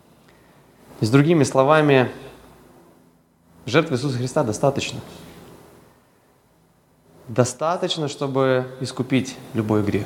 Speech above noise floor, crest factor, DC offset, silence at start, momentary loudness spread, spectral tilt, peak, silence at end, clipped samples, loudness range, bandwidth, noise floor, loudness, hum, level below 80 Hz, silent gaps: 38 dB; 22 dB; under 0.1%; 0.9 s; 13 LU; -6 dB/octave; 0 dBFS; 0 s; under 0.1%; 7 LU; 16.5 kHz; -58 dBFS; -21 LUFS; none; -60 dBFS; none